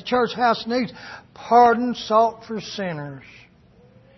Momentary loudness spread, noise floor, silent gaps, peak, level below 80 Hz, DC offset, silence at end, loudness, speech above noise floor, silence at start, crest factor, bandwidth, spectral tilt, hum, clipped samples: 23 LU; -53 dBFS; none; -4 dBFS; -58 dBFS; under 0.1%; 1 s; -20 LUFS; 32 dB; 0.05 s; 18 dB; 6.2 kHz; -5.5 dB/octave; none; under 0.1%